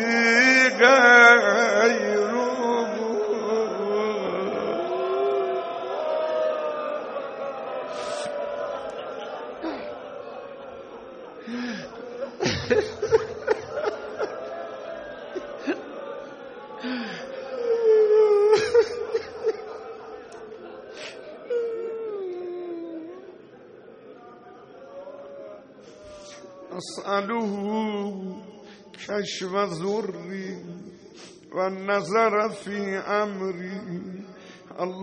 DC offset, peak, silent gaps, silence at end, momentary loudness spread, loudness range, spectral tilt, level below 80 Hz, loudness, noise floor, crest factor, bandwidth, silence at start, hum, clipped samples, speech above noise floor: under 0.1%; -2 dBFS; none; 0 s; 23 LU; 13 LU; -4 dB/octave; -64 dBFS; -23 LUFS; -47 dBFS; 24 dB; 9 kHz; 0 s; none; under 0.1%; 24 dB